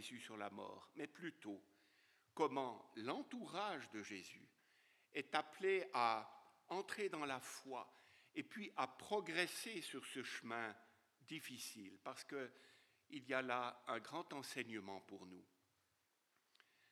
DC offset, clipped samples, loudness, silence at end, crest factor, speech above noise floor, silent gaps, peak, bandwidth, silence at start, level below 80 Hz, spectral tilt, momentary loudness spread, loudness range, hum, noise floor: under 0.1%; under 0.1%; -47 LUFS; 1.45 s; 26 dB; 37 dB; none; -22 dBFS; 16 kHz; 0 s; under -90 dBFS; -3.5 dB/octave; 14 LU; 6 LU; none; -84 dBFS